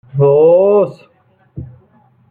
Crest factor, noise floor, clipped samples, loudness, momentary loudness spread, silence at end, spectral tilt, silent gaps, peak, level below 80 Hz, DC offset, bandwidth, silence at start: 12 dB; -53 dBFS; under 0.1%; -11 LUFS; 24 LU; 0.65 s; -11.5 dB/octave; none; -2 dBFS; -50 dBFS; under 0.1%; 4.5 kHz; 0.15 s